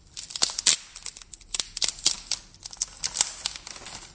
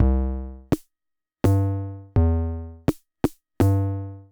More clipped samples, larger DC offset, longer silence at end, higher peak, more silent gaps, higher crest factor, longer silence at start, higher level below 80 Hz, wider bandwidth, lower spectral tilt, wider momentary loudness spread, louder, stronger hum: neither; neither; about the same, 0 s vs 0.1 s; first, 0 dBFS vs -10 dBFS; neither; first, 30 dB vs 14 dB; first, 0.15 s vs 0 s; second, -56 dBFS vs -30 dBFS; second, 8 kHz vs over 20 kHz; second, 1.5 dB/octave vs -8.5 dB/octave; first, 17 LU vs 9 LU; about the same, -26 LUFS vs -25 LUFS; neither